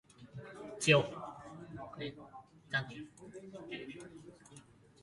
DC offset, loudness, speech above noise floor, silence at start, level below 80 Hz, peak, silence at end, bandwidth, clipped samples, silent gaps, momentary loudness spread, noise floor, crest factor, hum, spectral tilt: under 0.1%; -35 LUFS; 23 dB; 0.2 s; -70 dBFS; -14 dBFS; 0.4 s; 11.5 kHz; under 0.1%; none; 27 LU; -59 dBFS; 26 dB; none; -4.5 dB/octave